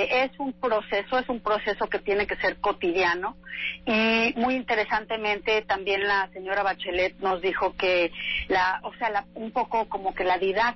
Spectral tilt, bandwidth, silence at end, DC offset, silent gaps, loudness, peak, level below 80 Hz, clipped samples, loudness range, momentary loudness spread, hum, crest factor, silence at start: -5 dB/octave; 6 kHz; 0 s; under 0.1%; none; -26 LUFS; -14 dBFS; -52 dBFS; under 0.1%; 1 LU; 6 LU; none; 12 dB; 0 s